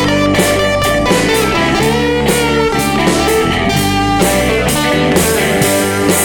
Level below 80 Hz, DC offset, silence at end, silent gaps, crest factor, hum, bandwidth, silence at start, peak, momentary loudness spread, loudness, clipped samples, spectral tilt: -28 dBFS; under 0.1%; 0 s; none; 12 dB; none; 19.5 kHz; 0 s; 0 dBFS; 1 LU; -12 LUFS; under 0.1%; -4 dB/octave